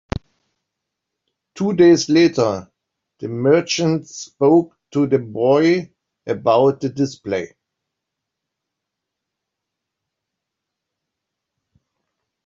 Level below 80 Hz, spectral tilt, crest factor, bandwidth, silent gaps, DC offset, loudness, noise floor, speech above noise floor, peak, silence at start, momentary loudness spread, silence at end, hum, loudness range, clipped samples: -50 dBFS; -5.5 dB/octave; 18 dB; 7.6 kHz; none; under 0.1%; -17 LUFS; -81 dBFS; 65 dB; -4 dBFS; 0.15 s; 16 LU; 5 s; none; 7 LU; under 0.1%